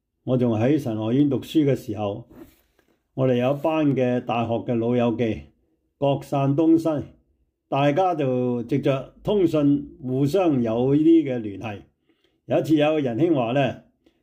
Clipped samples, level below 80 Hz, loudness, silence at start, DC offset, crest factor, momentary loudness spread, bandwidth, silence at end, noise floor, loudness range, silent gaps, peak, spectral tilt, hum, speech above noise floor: under 0.1%; -58 dBFS; -22 LUFS; 0.25 s; under 0.1%; 14 dB; 10 LU; 15.5 kHz; 0.45 s; -68 dBFS; 3 LU; none; -10 dBFS; -8 dB/octave; none; 47 dB